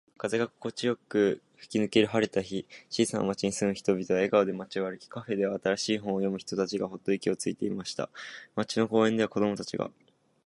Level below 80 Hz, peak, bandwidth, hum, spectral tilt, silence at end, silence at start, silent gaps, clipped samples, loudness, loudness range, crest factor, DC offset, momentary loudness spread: -66 dBFS; -10 dBFS; 11.5 kHz; none; -5 dB/octave; 0.6 s; 0.25 s; none; under 0.1%; -30 LUFS; 3 LU; 20 dB; under 0.1%; 11 LU